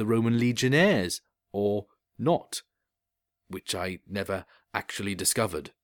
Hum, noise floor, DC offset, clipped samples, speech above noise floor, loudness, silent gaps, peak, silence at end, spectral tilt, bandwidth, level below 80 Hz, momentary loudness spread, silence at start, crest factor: none; -86 dBFS; under 0.1%; under 0.1%; 59 dB; -28 LUFS; none; -8 dBFS; 0.15 s; -4.5 dB/octave; 19 kHz; -62 dBFS; 14 LU; 0 s; 20 dB